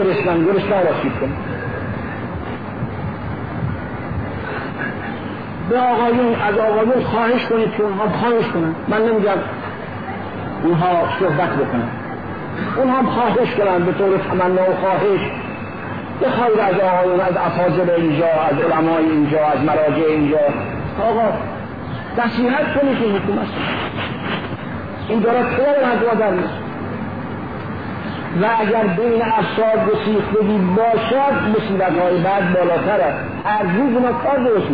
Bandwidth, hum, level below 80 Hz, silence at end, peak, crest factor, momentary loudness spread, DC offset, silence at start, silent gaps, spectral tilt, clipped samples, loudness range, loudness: 5 kHz; none; -44 dBFS; 0 s; -6 dBFS; 10 dB; 11 LU; 0.8%; 0 s; none; -10 dB/octave; under 0.1%; 4 LU; -18 LUFS